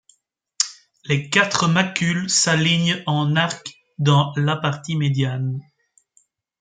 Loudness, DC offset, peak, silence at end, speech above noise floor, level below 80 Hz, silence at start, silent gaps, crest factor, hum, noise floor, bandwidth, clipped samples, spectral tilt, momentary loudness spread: -20 LUFS; under 0.1%; 0 dBFS; 1 s; 45 dB; -60 dBFS; 0.6 s; none; 20 dB; none; -64 dBFS; 9.6 kHz; under 0.1%; -4 dB/octave; 9 LU